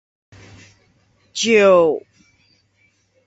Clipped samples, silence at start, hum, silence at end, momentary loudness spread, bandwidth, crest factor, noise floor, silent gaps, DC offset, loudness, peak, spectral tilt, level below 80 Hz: under 0.1%; 1.35 s; none; 1.3 s; 17 LU; 8 kHz; 18 dB; -62 dBFS; none; under 0.1%; -15 LUFS; -2 dBFS; -3.5 dB/octave; -60 dBFS